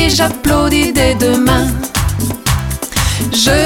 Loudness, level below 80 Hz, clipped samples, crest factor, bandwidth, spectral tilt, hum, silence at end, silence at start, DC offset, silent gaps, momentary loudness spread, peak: -13 LUFS; -22 dBFS; under 0.1%; 12 dB; 19.5 kHz; -4 dB/octave; none; 0 s; 0 s; under 0.1%; none; 5 LU; -2 dBFS